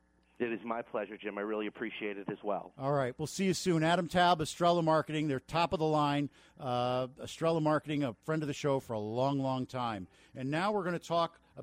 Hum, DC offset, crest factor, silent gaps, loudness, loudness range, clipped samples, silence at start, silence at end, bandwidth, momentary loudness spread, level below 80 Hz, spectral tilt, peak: none; under 0.1%; 16 dB; none; -33 LUFS; 5 LU; under 0.1%; 0.4 s; 0 s; 16 kHz; 10 LU; -64 dBFS; -5.5 dB/octave; -16 dBFS